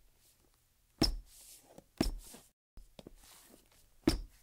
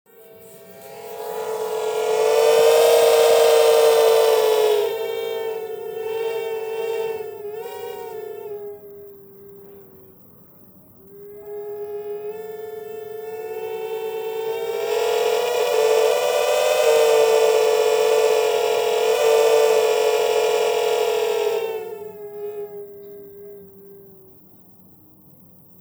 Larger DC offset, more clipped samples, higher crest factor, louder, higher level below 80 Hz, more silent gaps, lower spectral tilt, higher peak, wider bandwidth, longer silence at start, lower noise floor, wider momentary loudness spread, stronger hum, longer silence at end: neither; neither; first, 26 dB vs 16 dB; second, -36 LUFS vs -19 LUFS; first, -46 dBFS vs -70 dBFS; first, 2.53-2.77 s vs none; first, -4.5 dB/octave vs -1 dB/octave; second, -16 dBFS vs -4 dBFS; second, 16 kHz vs over 20 kHz; first, 1 s vs 0.4 s; first, -71 dBFS vs -49 dBFS; first, 24 LU vs 20 LU; neither; second, 0.15 s vs 1.8 s